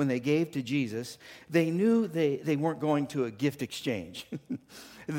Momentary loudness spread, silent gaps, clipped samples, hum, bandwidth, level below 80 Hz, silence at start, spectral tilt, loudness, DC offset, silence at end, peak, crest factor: 15 LU; none; under 0.1%; none; 17 kHz; -70 dBFS; 0 s; -6.5 dB/octave; -30 LUFS; under 0.1%; 0 s; -12 dBFS; 18 dB